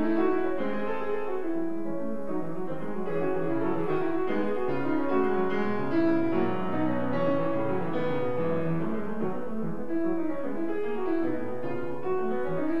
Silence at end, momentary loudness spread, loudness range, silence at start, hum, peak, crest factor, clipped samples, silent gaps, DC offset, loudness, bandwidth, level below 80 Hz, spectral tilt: 0 s; 7 LU; 4 LU; 0 s; none; -14 dBFS; 14 dB; under 0.1%; none; 3%; -30 LUFS; 6 kHz; -56 dBFS; -9 dB/octave